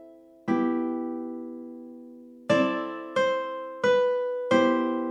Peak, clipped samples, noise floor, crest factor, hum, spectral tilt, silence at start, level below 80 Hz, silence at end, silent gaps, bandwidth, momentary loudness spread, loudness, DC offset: -8 dBFS; under 0.1%; -46 dBFS; 18 dB; 50 Hz at -60 dBFS; -5.5 dB/octave; 0 s; -80 dBFS; 0 s; none; 9.6 kHz; 19 LU; -26 LUFS; under 0.1%